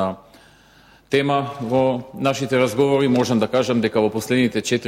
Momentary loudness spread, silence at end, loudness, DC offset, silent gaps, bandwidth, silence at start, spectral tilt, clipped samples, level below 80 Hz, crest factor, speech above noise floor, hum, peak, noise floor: 5 LU; 0 s; -20 LUFS; under 0.1%; none; 16 kHz; 0 s; -5.5 dB/octave; under 0.1%; -58 dBFS; 14 dB; 32 dB; none; -6 dBFS; -51 dBFS